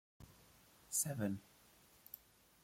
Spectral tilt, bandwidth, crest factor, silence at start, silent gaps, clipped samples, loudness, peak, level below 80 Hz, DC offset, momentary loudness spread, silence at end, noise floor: -4 dB/octave; 16.5 kHz; 24 dB; 0.2 s; none; under 0.1%; -41 LUFS; -24 dBFS; -76 dBFS; under 0.1%; 25 LU; 0.45 s; -68 dBFS